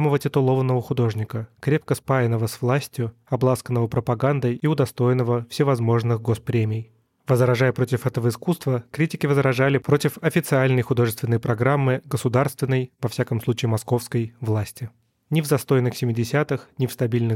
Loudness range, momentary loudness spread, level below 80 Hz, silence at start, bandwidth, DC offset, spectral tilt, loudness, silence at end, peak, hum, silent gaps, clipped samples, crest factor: 3 LU; 7 LU; -58 dBFS; 0 s; 16.5 kHz; under 0.1%; -7 dB/octave; -22 LUFS; 0 s; -6 dBFS; none; none; under 0.1%; 16 dB